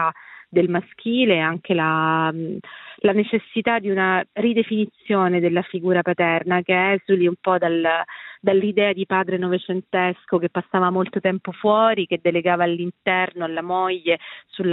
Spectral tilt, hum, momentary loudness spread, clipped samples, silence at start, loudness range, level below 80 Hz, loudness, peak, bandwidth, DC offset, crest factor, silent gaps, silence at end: -10.5 dB/octave; none; 6 LU; under 0.1%; 0 s; 2 LU; -70 dBFS; -21 LUFS; -4 dBFS; 4.1 kHz; under 0.1%; 16 dB; none; 0 s